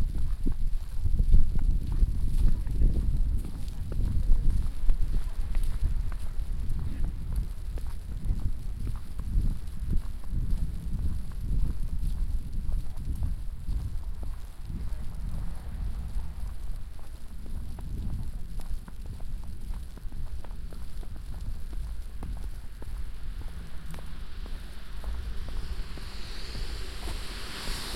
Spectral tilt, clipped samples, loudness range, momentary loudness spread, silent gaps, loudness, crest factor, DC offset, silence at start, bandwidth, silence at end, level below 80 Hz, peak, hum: -6 dB/octave; under 0.1%; 11 LU; 12 LU; none; -36 LUFS; 18 dB; under 0.1%; 0 s; 12.5 kHz; 0 s; -30 dBFS; -8 dBFS; none